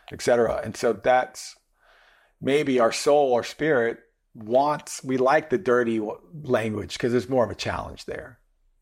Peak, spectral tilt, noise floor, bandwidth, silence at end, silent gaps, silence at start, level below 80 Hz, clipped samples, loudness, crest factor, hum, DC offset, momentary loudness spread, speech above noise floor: -10 dBFS; -5 dB/octave; -59 dBFS; 16 kHz; 0.5 s; none; 0.1 s; -56 dBFS; under 0.1%; -24 LUFS; 14 dB; none; under 0.1%; 15 LU; 36 dB